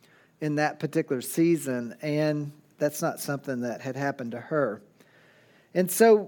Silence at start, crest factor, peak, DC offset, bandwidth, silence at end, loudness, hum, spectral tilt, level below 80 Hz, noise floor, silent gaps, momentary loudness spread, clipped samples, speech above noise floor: 0.4 s; 20 dB; -6 dBFS; under 0.1%; 18 kHz; 0 s; -28 LUFS; none; -5.5 dB/octave; -80 dBFS; -59 dBFS; none; 8 LU; under 0.1%; 33 dB